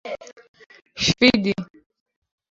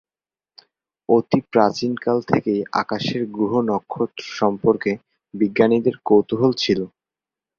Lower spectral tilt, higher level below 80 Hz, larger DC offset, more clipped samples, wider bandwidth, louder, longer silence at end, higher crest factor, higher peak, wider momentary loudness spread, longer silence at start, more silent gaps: second, -4 dB/octave vs -6.5 dB/octave; first, -52 dBFS vs -58 dBFS; neither; neither; about the same, 7.8 kHz vs 7.2 kHz; about the same, -19 LUFS vs -20 LUFS; first, 0.85 s vs 0.7 s; about the same, 22 dB vs 20 dB; about the same, -2 dBFS vs -2 dBFS; first, 23 LU vs 9 LU; second, 0.05 s vs 1.1 s; first, 0.49-0.54 s vs none